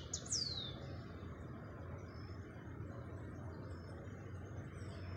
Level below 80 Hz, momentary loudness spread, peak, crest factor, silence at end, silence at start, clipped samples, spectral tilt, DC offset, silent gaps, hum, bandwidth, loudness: -60 dBFS; 12 LU; -26 dBFS; 22 dB; 0 s; 0 s; under 0.1%; -3.5 dB/octave; under 0.1%; none; none; 15 kHz; -47 LUFS